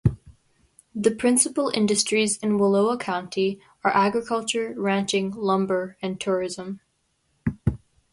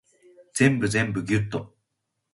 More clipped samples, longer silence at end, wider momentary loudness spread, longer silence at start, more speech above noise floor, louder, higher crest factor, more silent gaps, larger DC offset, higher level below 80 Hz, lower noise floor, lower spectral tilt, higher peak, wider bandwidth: neither; second, 0.35 s vs 0.65 s; about the same, 11 LU vs 12 LU; second, 0.05 s vs 0.55 s; second, 47 dB vs 56 dB; about the same, -23 LUFS vs -24 LUFS; about the same, 20 dB vs 20 dB; neither; neither; first, -46 dBFS vs -52 dBFS; second, -70 dBFS vs -80 dBFS; about the same, -4.5 dB/octave vs -5.5 dB/octave; about the same, -4 dBFS vs -6 dBFS; about the same, 11.5 kHz vs 11.5 kHz